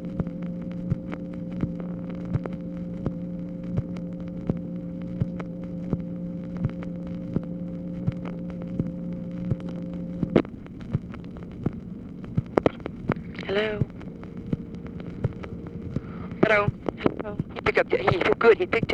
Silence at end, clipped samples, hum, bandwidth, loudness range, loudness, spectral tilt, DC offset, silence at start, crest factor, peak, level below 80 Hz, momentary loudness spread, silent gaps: 0 s; under 0.1%; none; 7.4 kHz; 6 LU; -29 LUFS; -8.5 dB/octave; under 0.1%; 0 s; 26 dB; -2 dBFS; -46 dBFS; 12 LU; none